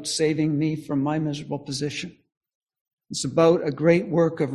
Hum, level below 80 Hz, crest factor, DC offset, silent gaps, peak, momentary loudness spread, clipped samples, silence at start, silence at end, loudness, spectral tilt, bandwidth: none; -60 dBFS; 18 dB; under 0.1%; 2.37-2.41 s, 2.55-2.61 s, 2.81-2.85 s, 2.93-2.97 s; -6 dBFS; 11 LU; under 0.1%; 0 s; 0 s; -23 LUFS; -5.5 dB/octave; 12.5 kHz